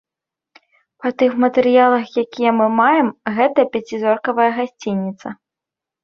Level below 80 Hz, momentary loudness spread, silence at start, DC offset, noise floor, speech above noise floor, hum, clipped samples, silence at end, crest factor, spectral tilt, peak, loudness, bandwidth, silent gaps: -64 dBFS; 11 LU; 1 s; under 0.1%; -86 dBFS; 70 dB; none; under 0.1%; 0.7 s; 16 dB; -6.5 dB/octave; -2 dBFS; -17 LUFS; 6.8 kHz; none